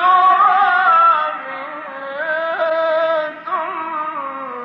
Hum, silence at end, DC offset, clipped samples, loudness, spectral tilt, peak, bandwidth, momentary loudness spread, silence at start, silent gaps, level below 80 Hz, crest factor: none; 0 s; under 0.1%; under 0.1%; -16 LUFS; -4.5 dB/octave; -4 dBFS; 6 kHz; 16 LU; 0 s; none; -76 dBFS; 12 dB